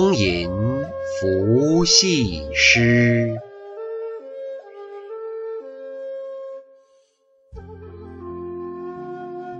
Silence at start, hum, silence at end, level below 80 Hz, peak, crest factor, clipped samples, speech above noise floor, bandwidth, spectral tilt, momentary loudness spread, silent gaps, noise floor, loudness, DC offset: 0 s; none; 0 s; -44 dBFS; -2 dBFS; 20 dB; under 0.1%; 43 dB; 8.2 kHz; -4 dB/octave; 24 LU; none; -60 dBFS; -18 LUFS; under 0.1%